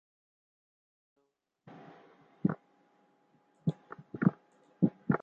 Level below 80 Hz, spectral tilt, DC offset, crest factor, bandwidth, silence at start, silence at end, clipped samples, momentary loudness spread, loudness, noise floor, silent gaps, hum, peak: -70 dBFS; -11 dB/octave; under 0.1%; 26 dB; 4.2 kHz; 1.7 s; 0.05 s; under 0.1%; 23 LU; -34 LUFS; -79 dBFS; none; none; -12 dBFS